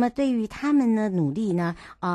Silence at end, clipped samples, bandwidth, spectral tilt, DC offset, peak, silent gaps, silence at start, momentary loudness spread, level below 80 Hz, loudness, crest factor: 0 s; under 0.1%; 11.5 kHz; -7.5 dB/octave; under 0.1%; -10 dBFS; none; 0 s; 7 LU; -56 dBFS; -24 LUFS; 12 dB